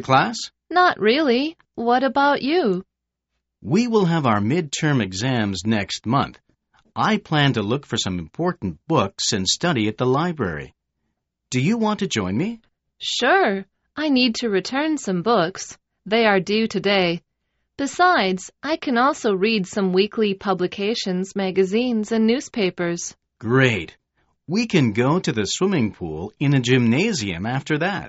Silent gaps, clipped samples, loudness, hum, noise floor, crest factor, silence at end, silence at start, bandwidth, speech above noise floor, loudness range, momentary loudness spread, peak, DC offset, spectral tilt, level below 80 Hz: none; under 0.1%; -21 LUFS; none; -79 dBFS; 18 dB; 0 s; 0 s; 8 kHz; 59 dB; 2 LU; 10 LU; -2 dBFS; under 0.1%; -4 dB/octave; -56 dBFS